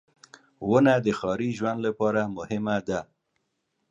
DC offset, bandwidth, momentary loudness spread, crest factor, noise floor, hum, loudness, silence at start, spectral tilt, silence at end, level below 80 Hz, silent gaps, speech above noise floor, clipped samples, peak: under 0.1%; 10 kHz; 11 LU; 20 dB; -77 dBFS; none; -26 LUFS; 0.6 s; -7 dB/octave; 0.85 s; -60 dBFS; none; 52 dB; under 0.1%; -8 dBFS